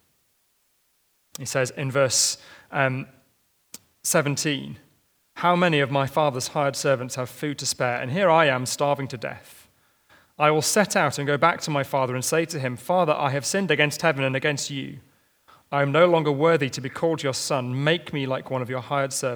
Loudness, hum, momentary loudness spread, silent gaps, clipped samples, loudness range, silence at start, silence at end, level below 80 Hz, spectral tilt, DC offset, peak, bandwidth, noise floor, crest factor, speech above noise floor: -23 LUFS; none; 11 LU; none; under 0.1%; 3 LU; 1.4 s; 0 s; -70 dBFS; -4 dB/octave; under 0.1%; -2 dBFS; over 20 kHz; -67 dBFS; 22 dB; 44 dB